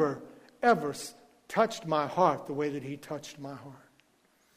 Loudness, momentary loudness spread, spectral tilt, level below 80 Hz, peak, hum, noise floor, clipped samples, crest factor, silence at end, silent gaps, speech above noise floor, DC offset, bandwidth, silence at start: -30 LUFS; 17 LU; -5 dB/octave; -72 dBFS; -12 dBFS; none; -68 dBFS; under 0.1%; 20 dB; 0.8 s; none; 38 dB; under 0.1%; 15.5 kHz; 0 s